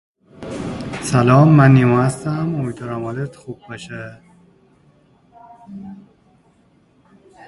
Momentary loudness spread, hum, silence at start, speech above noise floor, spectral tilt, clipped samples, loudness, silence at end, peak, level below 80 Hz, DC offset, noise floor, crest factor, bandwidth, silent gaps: 26 LU; none; 0.4 s; 40 dB; -7.5 dB/octave; under 0.1%; -16 LUFS; 1.5 s; 0 dBFS; -50 dBFS; under 0.1%; -55 dBFS; 18 dB; 11.5 kHz; none